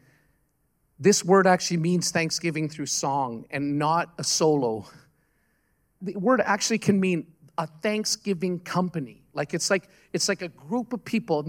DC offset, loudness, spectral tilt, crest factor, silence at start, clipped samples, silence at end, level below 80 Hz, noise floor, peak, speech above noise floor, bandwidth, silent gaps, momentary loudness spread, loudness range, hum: under 0.1%; -25 LUFS; -4 dB/octave; 20 dB; 1 s; under 0.1%; 0 s; -68 dBFS; -70 dBFS; -6 dBFS; 45 dB; 16.5 kHz; none; 11 LU; 4 LU; none